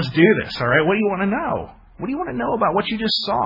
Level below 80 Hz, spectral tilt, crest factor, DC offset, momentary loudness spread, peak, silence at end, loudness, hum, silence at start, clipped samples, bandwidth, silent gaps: -48 dBFS; -7 dB/octave; 18 dB; under 0.1%; 12 LU; -2 dBFS; 0 s; -20 LUFS; none; 0 s; under 0.1%; 5.8 kHz; none